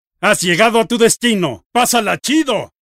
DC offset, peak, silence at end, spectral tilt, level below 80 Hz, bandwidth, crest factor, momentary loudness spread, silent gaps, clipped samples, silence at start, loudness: under 0.1%; 0 dBFS; 0.25 s; -3 dB/octave; -56 dBFS; 16 kHz; 14 dB; 5 LU; 1.66-1.70 s; under 0.1%; 0.2 s; -14 LUFS